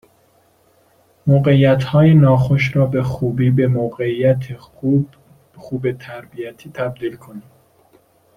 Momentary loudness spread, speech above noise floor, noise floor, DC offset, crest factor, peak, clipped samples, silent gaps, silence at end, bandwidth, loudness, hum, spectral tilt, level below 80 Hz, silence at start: 19 LU; 40 dB; -56 dBFS; under 0.1%; 16 dB; -2 dBFS; under 0.1%; none; 0.95 s; 6.4 kHz; -16 LUFS; none; -9 dB/octave; -48 dBFS; 1.25 s